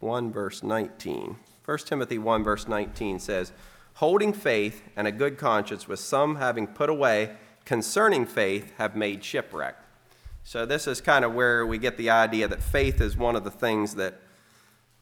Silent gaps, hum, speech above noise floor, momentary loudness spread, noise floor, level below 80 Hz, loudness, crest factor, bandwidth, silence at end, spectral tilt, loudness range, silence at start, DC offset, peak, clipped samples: none; none; 34 dB; 11 LU; -60 dBFS; -42 dBFS; -26 LUFS; 20 dB; 19 kHz; 0.85 s; -4.5 dB/octave; 5 LU; 0 s; under 0.1%; -6 dBFS; under 0.1%